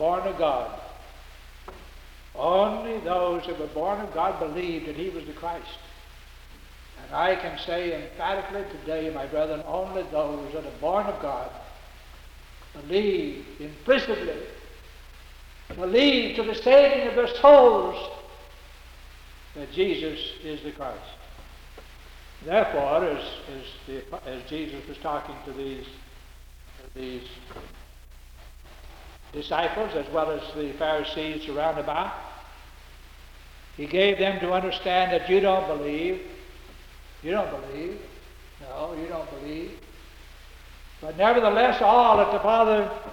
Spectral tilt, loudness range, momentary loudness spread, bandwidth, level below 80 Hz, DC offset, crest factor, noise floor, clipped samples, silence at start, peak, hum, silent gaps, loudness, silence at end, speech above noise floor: -5.5 dB/octave; 16 LU; 23 LU; 18.5 kHz; -48 dBFS; under 0.1%; 22 dB; -47 dBFS; under 0.1%; 0 s; -4 dBFS; none; none; -24 LUFS; 0 s; 22 dB